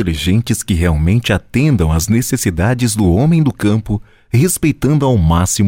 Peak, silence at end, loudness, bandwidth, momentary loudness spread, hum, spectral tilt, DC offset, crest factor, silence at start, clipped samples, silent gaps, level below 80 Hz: -2 dBFS; 0 s; -14 LUFS; 17 kHz; 4 LU; none; -5.5 dB/octave; under 0.1%; 12 dB; 0 s; under 0.1%; none; -26 dBFS